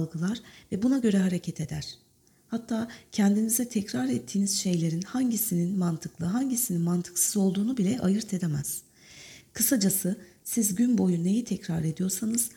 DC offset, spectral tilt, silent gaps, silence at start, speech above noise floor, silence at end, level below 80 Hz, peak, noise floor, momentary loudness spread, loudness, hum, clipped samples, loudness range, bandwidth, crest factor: under 0.1%; -5 dB/octave; none; 0 s; 23 dB; 0.05 s; -62 dBFS; -10 dBFS; -50 dBFS; 11 LU; -27 LUFS; none; under 0.1%; 2 LU; 20 kHz; 18 dB